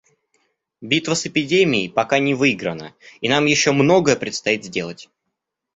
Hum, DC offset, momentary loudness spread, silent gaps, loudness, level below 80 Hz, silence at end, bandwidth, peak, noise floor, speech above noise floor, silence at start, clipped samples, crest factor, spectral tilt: none; under 0.1%; 12 LU; none; -18 LUFS; -58 dBFS; 0.7 s; 8.4 kHz; 0 dBFS; -79 dBFS; 60 dB; 0.8 s; under 0.1%; 20 dB; -4 dB/octave